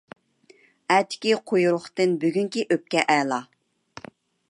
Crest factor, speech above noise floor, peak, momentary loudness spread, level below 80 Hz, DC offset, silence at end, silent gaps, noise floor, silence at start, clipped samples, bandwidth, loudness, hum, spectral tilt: 22 dB; 35 dB; -2 dBFS; 17 LU; -74 dBFS; under 0.1%; 1.05 s; none; -57 dBFS; 0.9 s; under 0.1%; 11.5 kHz; -23 LUFS; none; -4.5 dB/octave